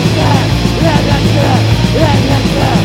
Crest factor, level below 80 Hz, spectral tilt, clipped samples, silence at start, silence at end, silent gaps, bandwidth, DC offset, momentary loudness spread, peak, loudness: 10 dB; -22 dBFS; -6 dB/octave; 0.6%; 0 s; 0 s; none; 16 kHz; under 0.1%; 1 LU; 0 dBFS; -10 LUFS